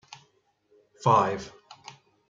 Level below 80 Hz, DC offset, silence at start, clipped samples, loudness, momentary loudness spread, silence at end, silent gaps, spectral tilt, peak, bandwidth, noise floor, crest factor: -68 dBFS; under 0.1%; 1 s; under 0.1%; -25 LUFS; 25 LU; 0.8 s; none; -6 dB/octave; -8 dBFS; 7.8 kHz; -68 dBFS; 20 dB